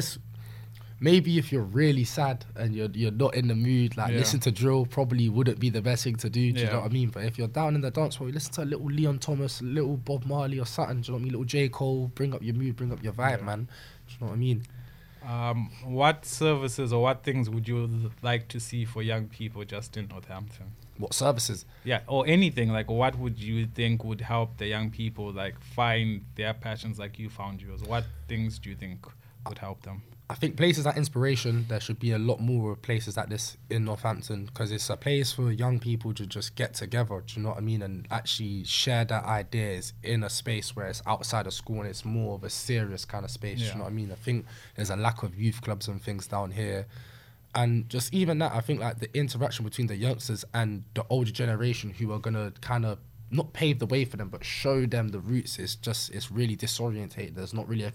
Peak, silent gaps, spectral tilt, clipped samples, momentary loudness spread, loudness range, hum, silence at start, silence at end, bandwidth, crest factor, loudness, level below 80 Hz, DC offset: -6 dBFS; none; -5.5 dB/octave; under 0.1%; 12 LU; 6 LU; none; 0 s; 0 s; 16.5 kHz; 22 dB; -29 LUFS; -54 dBFS; under 0.1%